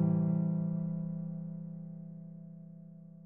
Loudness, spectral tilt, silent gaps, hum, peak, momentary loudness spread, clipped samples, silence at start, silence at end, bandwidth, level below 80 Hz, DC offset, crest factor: -36 LUFS; -15 dB/octave; none; none; -20 dBFS; 20 LU; under 0.1%; 0 s; 0 s; 1.9 kHz; -72 dBFS; under 0.1%; 16 dB